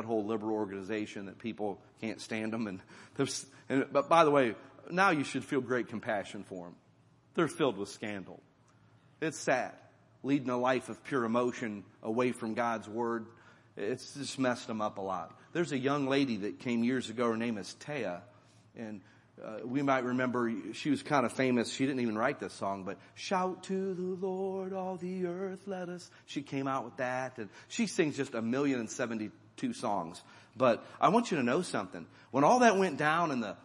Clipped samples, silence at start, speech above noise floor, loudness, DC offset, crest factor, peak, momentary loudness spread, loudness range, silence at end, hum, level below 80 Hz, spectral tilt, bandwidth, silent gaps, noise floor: under 0.1%; 0 s; 32 dB; -33 LUFS; under 0.1%; 24 dB; -10 dBFS; 14 LU; 7 LU; 0.05 s; none; -80 dBFS; -5 dB/octave; 11.5 kHz; none; -64 dBFS